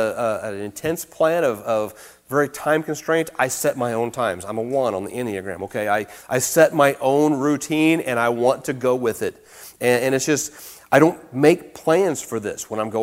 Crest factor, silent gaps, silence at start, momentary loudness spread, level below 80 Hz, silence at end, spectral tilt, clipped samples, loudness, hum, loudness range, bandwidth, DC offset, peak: 20 dB; none; 0 s; 11 LU; -60 dBFS; 0 s; -4.5 dB/octave; under 0.1%; -21 LUFS; none; 4 LU; 16 kHz; under 0.1%; 0 dBFS